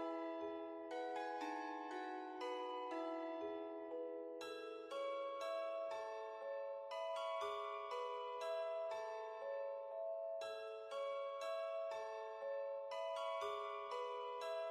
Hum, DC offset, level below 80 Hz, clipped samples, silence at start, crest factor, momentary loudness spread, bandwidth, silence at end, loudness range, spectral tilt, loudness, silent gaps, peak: none; under 0.1%; under -90 dBFS; under 0.1%; 0 s; 12 dB; 5 LU; 13.5 kHz; 0 s; 1 LU; -2.5 dB/octave; -46 LUFS; none; -34 dBFS